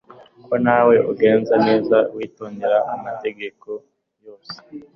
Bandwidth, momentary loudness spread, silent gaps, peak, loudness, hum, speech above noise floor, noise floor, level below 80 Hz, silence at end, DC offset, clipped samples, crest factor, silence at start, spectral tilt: 6 kHz; 19 LU; none; -4 dBFS; -18 LUFS; none; 28 dB; -46 dBFS; -62 dBFS; 0.15 s; under 0.1%; under 0.1%; 16 dB; 0.5 s; -8 dB/octave